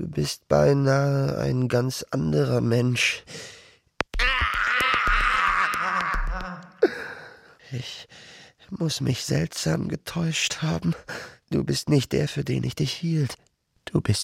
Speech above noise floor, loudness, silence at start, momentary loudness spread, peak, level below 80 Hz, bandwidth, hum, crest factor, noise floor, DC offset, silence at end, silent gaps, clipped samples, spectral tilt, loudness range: 23 dB; -24 LUFS; 0 s; 16 LU; -6 dBFS; -38 dBFS; 16 kHz; none; 18 dB; -48 dBFS; under 0.1%; 0 s; none; under 0.1%; -5 dB/octave; 6 LU